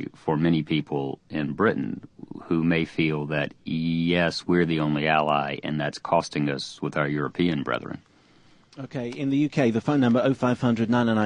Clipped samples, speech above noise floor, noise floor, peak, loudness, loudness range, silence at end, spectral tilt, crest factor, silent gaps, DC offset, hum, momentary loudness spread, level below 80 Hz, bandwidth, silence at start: under 0.1%; 32 dB; -56 dBFS; -6 dBFS; -25 LUFS; 4 LU; 0 s; -6.5 dB/octave; 18 dB; none; under 0.1%; none; 9 LU; -54 dBFS; 10 kHz; 0 s